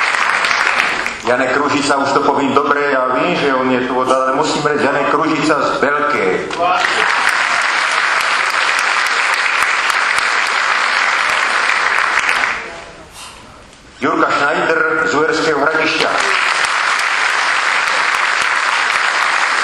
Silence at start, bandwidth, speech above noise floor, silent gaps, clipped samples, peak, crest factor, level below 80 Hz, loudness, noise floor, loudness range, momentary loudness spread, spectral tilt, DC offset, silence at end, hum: 0 s; 15.5 kHz; 25 dB; none; under 0.1%; 0 dBFS; 14 dB; -52 dBFS; -13 LUFS; -39 dBFS; 3 LU; 3 LU; -2.5 dB/octave; under 0.1%; 0 s; none